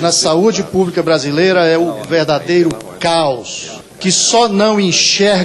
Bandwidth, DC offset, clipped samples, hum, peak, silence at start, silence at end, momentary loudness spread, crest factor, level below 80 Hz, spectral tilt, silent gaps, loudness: 12.5 kHz; under 0.1%; under 0.1%; none; -2 dBFS; 0 s; 0 s; 9 LU; 12 dB; -50 dBFS; -3.5 dB/octave; none; -12 LUFS